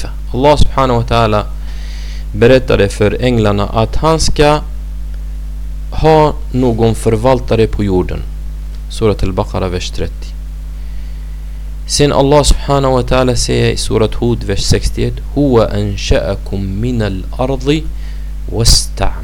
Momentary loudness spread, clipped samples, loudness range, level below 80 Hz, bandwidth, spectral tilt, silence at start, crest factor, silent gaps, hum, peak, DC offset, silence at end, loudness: 16 LU; under 0.1%; 5 LU; -20 dBFS; 17.5 kHz; -5 dB/octave; 0 s; 12 dB; none; none; 0 dBFS; under 0.1%; 0 s; -13 LUFS